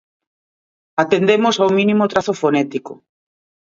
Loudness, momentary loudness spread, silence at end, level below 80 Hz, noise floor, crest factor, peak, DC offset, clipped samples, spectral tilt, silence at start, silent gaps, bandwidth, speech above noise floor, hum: -16 LUFS; 9 LU; 0.75 s; -62 dBFS; under -90 dBFS; 18 dB; 0 dBFS; under 0.1%; under 0.1%; -5.5 dB/octave; 0.95 s; none; 7.6 kHz; over 74 dB; none